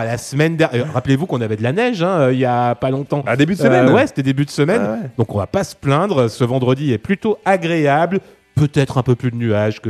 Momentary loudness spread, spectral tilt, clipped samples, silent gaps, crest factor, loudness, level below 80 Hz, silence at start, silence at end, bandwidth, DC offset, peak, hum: 6 LU; -7 dB/octave; under 0.1%; none; 16 dB; -17 LUFS; -50 dBFS; 0 s; 0 s; 13.5 kHz; under 0.1%; 0 dBFS; none